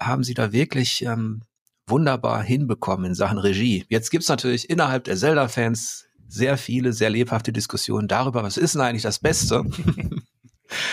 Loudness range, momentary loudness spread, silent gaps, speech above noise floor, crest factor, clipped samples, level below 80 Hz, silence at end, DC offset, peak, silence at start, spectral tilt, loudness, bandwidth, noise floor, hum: 1 LU; 7 LU; 1.61-1.66 s; 33 dB; 16 dB; under 0.1%; -46 dBFS; 0 s; under 0.1%; -8 dBFS; 0 s; -5 dB/octave; -22 LUFS; 15.5 kHz; -55 dBFS; none